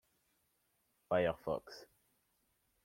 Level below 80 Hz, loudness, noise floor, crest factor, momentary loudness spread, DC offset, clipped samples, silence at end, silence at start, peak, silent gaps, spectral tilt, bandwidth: -72 dBFS; -38 LUFS; -80 dBFS; 22 dB; 20 LU; under 0.1%; under 0.1%; 1 s; 1.1 s; -22 dBFS; none; -6.5 dB/octave; 16.5 kHz